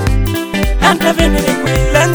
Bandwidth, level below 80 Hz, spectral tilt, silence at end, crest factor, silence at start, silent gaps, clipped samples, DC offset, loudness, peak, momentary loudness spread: over 20 kHz; -18 dBFS; -5 dB/octave; 0 s; 12 dB; 0 s; none; 0.2%; under 0.1%; -13 LUFS; 0 dBFS; 5 LU